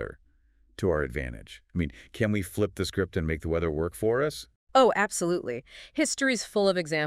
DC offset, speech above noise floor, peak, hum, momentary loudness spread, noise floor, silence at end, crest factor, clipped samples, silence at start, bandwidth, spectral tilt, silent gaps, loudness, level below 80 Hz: under 0.1%; 36 dB; -8 dBFS; none; 13 LU; -63 dBFS; 0 s; 20 dB; under 0.1%; 0 s; 16 kHz; -4.5 dB/octave; 4.56-4.67 s; -28 LUFS; -48 dBFS